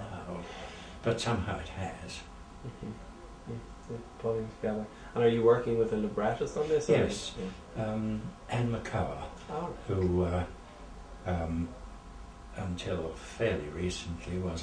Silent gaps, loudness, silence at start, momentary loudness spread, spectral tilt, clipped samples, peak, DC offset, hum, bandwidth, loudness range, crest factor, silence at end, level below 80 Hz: none; -33 LUFS; 0 s; 18 LU; -6 dB/octave; under 0.1%; -12 dBFS; under 0.1%; none; 10.5 kHz; 9 LU; 20 dB; 0 s; -48 dBFS